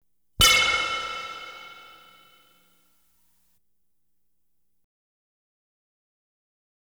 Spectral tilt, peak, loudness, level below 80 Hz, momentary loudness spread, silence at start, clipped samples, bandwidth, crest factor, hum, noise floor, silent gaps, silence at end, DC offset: 0 dB/octave; -4 dBFS; -20 LUFS; -46 dBFS; 25 LU; 0.4 s; under 0.1%; over 20 kHz; 26 dB; none; -79 dBFS; none; 5 s; under 0.1%